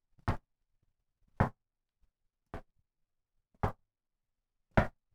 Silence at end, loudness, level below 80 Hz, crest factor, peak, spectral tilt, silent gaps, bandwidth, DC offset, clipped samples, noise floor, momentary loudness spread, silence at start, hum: 0.25 s; -36 LUFS; -48 dBFS; 30 dB; -10 dBFS; -8 dB/octave; none; 13 kHz; under 0.1%; under 0.1%; -87 dBFS; 18 LU; 0.25 s; none